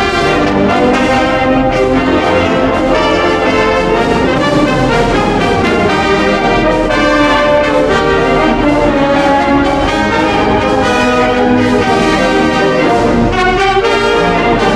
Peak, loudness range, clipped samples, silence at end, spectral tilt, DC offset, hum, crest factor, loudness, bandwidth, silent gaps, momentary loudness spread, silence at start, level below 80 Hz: 0 dBFS; 1 LU; under 0.1%; 0 s; -5.5 dB/octave; under 0.1%; none; 10 dB; -10 LUFS; 12.5 kHz; none; 1 LU; 0 s; -26 dBFS